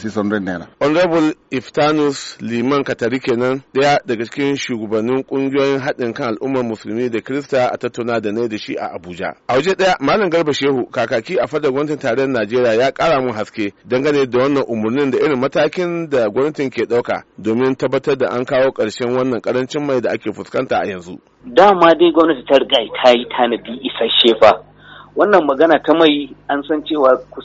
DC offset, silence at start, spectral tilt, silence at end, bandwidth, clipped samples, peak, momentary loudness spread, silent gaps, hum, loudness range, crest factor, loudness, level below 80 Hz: under 0.1%; 0 s; -3 dB/octave; 0 s; 8 kHz; under 0.1%; 0 dBFS; 10 LU; none; none; 5 LU; 16 dB; -16 LUFS; -54 dBFS